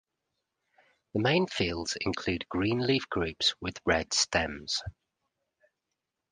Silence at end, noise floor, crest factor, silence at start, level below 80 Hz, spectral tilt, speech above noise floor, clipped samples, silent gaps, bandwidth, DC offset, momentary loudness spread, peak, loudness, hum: 1.4 s; -86 dBFS; 22 dB; 1.15 s; -52 dBFS; -3.5 dB/octave; 56 dB; under 0.1%; none; 10 kHz; under 0.1%; 7 LU; -10 dBFS; -29 LUFS; none